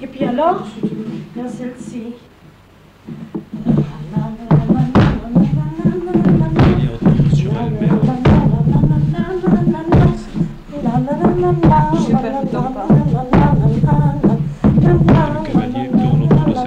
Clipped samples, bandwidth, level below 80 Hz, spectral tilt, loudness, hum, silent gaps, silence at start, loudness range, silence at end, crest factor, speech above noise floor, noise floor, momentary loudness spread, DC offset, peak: under 0.1%; 7.8 kHz; -28 dBFS; -9.5 dB/octave; -15 LUFS; none; none; 0 s; 9 LU; 0 s; 12 dB; 29 dB; -45 dBFS; 14 LU; under 0.1%; -2 dBFS